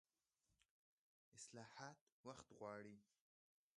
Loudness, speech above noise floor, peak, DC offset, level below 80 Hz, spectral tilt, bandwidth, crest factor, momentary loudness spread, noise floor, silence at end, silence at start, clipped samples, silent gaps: -60 LUFS; over 31 dB; -40 dBFS; under 0.1%; under -90 dBFS; -4 dB/octave; 11 kHz; 24 dB; 6 LU; under -90 dBFS; 0.75 s; 0.5 s; under 0.1%; 0.65-1.32 s, 2.01-2.24 s